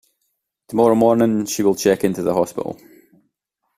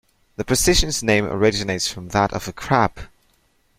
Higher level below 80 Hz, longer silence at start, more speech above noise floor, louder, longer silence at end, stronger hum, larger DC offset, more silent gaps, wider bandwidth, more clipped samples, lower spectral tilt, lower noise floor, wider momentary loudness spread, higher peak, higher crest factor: second, -58 dBFS vs -34 dBFS; first, 0.7 s vs 0.4 s; first, 57 dB vs 42 dB; about the same, -18 LUFS vs -20 LUFS; first, 1.05 s vs 0.7 s; neither; neither; neither; about the same, 15.5 kHz vs 16.5 kHz; neither; first, -5.5 dB/octave vs -3.5 dB/octave; first, -74 dBFS vs -62 dBFS; first, 13 LU vs 8 LU; about the same, -2 dBFS vs -2 dBFS; about the same, 16 dB vs 18 dB